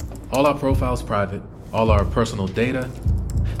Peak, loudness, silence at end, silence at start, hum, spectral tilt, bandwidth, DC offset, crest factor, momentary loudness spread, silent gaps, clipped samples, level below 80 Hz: -4 dBFS; -22 LUFS; 0 s; 0 s; none; -7 dB/octave; 15.5 kHz; under 0.1%; 16 dB; 7 LU; none; under 0.1%; -28 dBFS